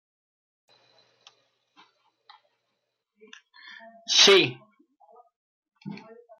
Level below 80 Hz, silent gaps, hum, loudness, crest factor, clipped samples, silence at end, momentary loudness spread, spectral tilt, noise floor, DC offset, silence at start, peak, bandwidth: -84 dBFS; 5.36-5.63 s; none; -18 LUFS; 24 dB; under 0.1%; 0.45 s; 30 LU; -1.5 dB/octave; -80 dBFS; under 0.1%; 4.1 s; -4 dBFS; 13.5 kHz